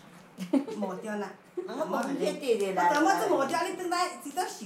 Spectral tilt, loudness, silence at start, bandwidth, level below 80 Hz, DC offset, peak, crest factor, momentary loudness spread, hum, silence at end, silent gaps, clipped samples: -4 dB/octave; -29 LUFS; 0.05 s; 16 kHz; -82 dBFS; under 0.1%; -12 dBFS; 18 dB; 12 LU; none; 0 s; none; under 0.1%